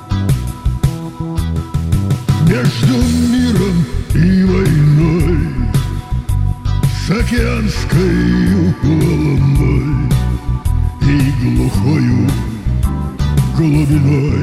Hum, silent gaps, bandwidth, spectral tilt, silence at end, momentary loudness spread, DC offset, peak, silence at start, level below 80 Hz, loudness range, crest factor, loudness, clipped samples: none; none; 15 kHz; -7 dB/octave; 0 s; 7 LU; under 0.1%; -2 dBFS; 0 s; -20 dBFS; 3 LU; 12 dB; -14 LUFS; under 0.1%